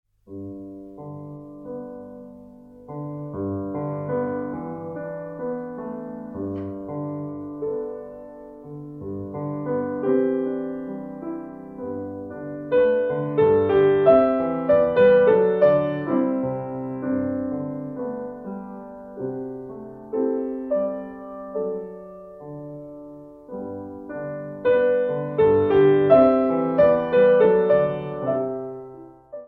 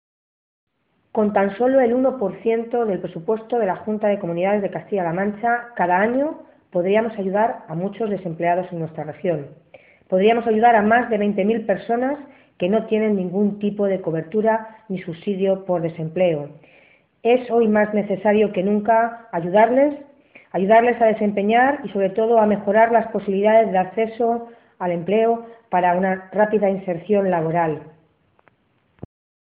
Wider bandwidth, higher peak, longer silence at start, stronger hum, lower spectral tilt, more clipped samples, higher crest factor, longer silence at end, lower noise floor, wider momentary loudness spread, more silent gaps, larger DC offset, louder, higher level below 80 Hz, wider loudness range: about the same, 4.3 kHz vs 4.1 kHz; about the same, -4 dBFS vs -4 dBFS; second, 0.3 s vs 1.15 s; neither; second, -10 dB/octave vs -11.5 dB/octave; neither; about the same, 20 dB vs 16 dB; second, 0 s vs 1.55 s; second, -45 dBFS vs -64 dBFS; first, 22 LU vs 10 LU; neither; neither; about the same, -22 LUFS vs -20 LUFS; first, -56 dBFS vs -62 dBFS; first, 14 LU vs 5 LU